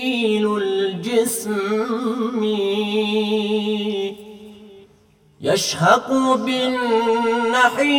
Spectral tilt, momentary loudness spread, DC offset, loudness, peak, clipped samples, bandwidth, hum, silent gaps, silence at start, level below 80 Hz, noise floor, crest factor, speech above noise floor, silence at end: -4 dB/octave; 6 LU; under 0.1%; -19 LUFS; -2 dBFS; under 0.1%; 17.5 kHz; none; none; 0 s; -66 dBFS; -54 dBFS; 18 dB; 36 dB; 0 s